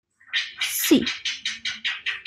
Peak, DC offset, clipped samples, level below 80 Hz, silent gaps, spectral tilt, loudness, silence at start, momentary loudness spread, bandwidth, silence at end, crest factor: -4 dBFS; under 0.1%; under 0.1%; -62 dBFS; none; -1.5 dB/octave; -24 LUFS; 0.3 s; 8 LU; 15.5 kHz; 0.05 s; 20 dB